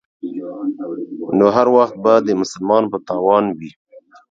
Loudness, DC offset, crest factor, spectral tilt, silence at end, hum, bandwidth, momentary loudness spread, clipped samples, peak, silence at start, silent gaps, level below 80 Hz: -16 LUFS; under 0.1%; 16 dB; -6.5 dB/octave; 0.3 s; none; 7.8 kHz; 15 LU; under 0.1%; 0 dBFS; 0.25 s; 3.76-3.85 s; -60 dBFS